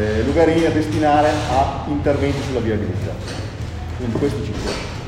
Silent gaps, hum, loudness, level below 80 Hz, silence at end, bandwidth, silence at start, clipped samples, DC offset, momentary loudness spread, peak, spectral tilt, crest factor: none; none; -20 LUFS; -34 dBFS; 0 s; 15 kHz; 0 s; under 0.1%; under 0.1%; 12 LU; -2 dBFS; -6.5 dB/octave; 16 dB